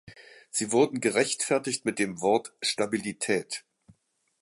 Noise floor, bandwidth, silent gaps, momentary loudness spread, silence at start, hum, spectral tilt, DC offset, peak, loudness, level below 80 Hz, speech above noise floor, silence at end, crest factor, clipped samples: -69 dBFS; 11.5 kHz; none; 7 LU; 0.05 s; none; -3 dB/octave; under 0.1%; -10 dBFS; -27 LUFS; -70 dBFS; 42 dB; 0.85 s; 20 dB; under 0.1%